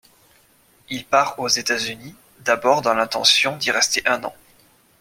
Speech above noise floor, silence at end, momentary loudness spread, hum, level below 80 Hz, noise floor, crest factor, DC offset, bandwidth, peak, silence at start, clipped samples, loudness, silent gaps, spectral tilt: 36 dB; 0.7 s; 15 LU; none; -62 dBFS; -57 dBFS; 20 dB; under 0.1%; 16.5 kHz; 0 dBFS; 0.9 s; under 0.1%; -19 LUFS; none; -1 dB/octave